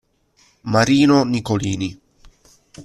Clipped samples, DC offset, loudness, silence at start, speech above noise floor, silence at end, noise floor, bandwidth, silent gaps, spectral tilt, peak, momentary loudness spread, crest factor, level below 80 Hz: under 0.1%; under 0.1%; -17 LUFS; 0.65 s; 42 dB; 0 s; -58 dBFS; 12.5 kHz; none; -5.5 dB/octave; -2 dBFS; 14 LU; 18 dB; -50 dBFS